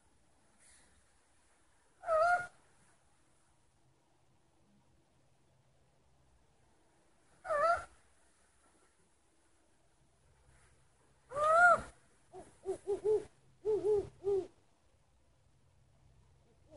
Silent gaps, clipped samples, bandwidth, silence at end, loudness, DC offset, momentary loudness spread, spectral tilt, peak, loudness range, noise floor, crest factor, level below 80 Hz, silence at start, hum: none; under 0.1%; 11.5 kHz; 2.3 s; -33 LUFS; under 0.1%; 22 LU; -4.5 dB/octave; -16 dBFS; 8 LU; -73 dBFS; 24 dB; -70 dBFS; 2.05 s; none